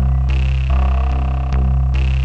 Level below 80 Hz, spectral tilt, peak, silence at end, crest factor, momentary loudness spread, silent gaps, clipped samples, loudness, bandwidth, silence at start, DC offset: -16 dBFS; -8 dB/octave; -8 dBFS; 0 s; 6 dB; 2 LU; none; under 0.1%; -18 LUFS; 5 kHz; 0 s; 2%